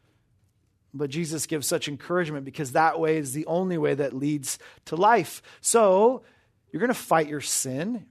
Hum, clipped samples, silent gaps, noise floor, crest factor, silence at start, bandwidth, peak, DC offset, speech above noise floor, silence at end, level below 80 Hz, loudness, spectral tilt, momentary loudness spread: none; under 0.1%; none; -67 dBFS; 18 dB; 0.95 s; 13.5 kHz; -8 dBFS; under 0.1%; 42 dB; 0.05 s; -70 dBFS; -25 LUFS; -4 dB/octave; 12 LU